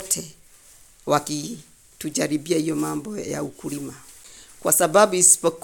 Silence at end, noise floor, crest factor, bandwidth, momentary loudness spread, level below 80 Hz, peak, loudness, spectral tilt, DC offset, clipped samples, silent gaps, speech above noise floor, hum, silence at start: 0.05 s; -51 dBFS; 22 dB; 17.5 kHz; 20 LU; -60 dBFS; -2 dBFS; -21 LUFS; -3 dB/octave; under 0.1%; under 0.1%; none; 29 dB; none; 0 s